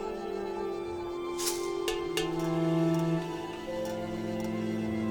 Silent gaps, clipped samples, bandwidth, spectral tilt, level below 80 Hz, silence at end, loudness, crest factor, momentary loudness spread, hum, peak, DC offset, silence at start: none; under 0.1%; over 20 kHz; -5.5 dB/octave; -56 dBFS; 0 s; -32 LUFS; 16 dB; 8 LU; none; -16 dBFS; under 0.1%; 0 s